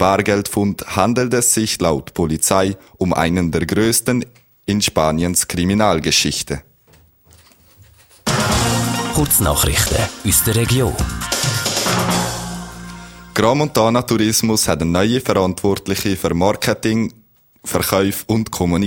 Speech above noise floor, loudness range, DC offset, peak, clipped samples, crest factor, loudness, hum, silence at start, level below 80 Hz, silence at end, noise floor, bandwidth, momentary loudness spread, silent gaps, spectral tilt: 35 dB; 3 LU; under 0.1%; 0 dBFS; under 0.1%; 18 dB; -17 LUFS; none; 0 s; -34 dBFS; 0 s; -51 dBFS; 17 kHz; 8 LU; none; -4 dB/octave